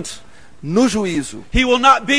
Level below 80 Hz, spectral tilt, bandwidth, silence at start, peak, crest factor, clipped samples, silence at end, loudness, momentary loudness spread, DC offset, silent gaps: -32 dBFS; -4 dB/octave; 11 kHz; 0 s; 0 dBFS; 16 dB; under 0.1%; 0 s; -16 LUFS; 20 LU; 1%; none